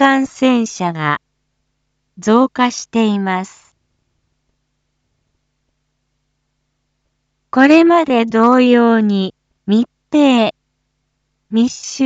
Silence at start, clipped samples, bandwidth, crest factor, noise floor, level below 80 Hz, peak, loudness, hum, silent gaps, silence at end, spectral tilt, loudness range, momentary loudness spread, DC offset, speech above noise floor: 0 s; under 0.1%; 8 kHz; 16 dB; -69 dBFS; -62 dBFS; 0 dBFS; -14 LUFS; none; none; 0 s; -5 dB/octave; 9 LU; 11 LU; under 0.1%; 56 dB